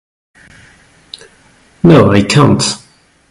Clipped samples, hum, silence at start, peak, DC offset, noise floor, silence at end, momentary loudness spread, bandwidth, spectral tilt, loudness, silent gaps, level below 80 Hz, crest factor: 2%; none; 1.85 s; 0 dBFS; under 0.1%; -47 dBFS; 0.55 s; 26 LU; 11.5 kHz; -5.5 dB/octave; -9 LUFS; none; -38 dBFS; 12 dB